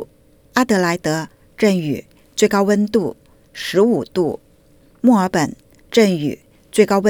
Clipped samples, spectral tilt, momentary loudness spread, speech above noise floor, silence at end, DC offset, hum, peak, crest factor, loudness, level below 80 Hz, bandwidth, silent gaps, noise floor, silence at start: under 0.1%; -5.5 dB/octave; 13 LU; 35 dB; 0 s; under 0.1%; none; 0 dBFS; 18 dB; -18 LUFS; -54 dBFS; 20 kHz; none; -51 dBFS; 0 s